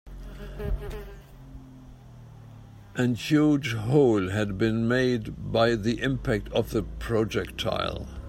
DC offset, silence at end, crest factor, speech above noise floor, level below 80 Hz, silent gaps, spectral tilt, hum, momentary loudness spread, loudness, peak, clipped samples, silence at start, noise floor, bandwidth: under 0.1%; 0 s; 18 dB; 21 dB; -42 dBFS; none; -6.5 dB/octave; none; 20 LU; -26 LUFS; -8 dBFS; under 0.1%; 0.05 s; -47 dBFS; 16 kHz